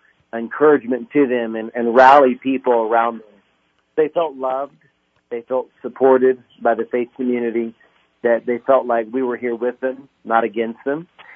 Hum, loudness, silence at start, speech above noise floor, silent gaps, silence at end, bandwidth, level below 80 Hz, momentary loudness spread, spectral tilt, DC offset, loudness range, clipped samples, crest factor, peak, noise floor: none; -18 LUFS; 0.35 s; 46 dB; none; 0.3 s; 7.2 kHz; -66 dBFS; 14 LU; -7 dB/octave; under 0.1%; 6 LU; under 0.1%; 18 dB; 0 dBFS; -64 dBFS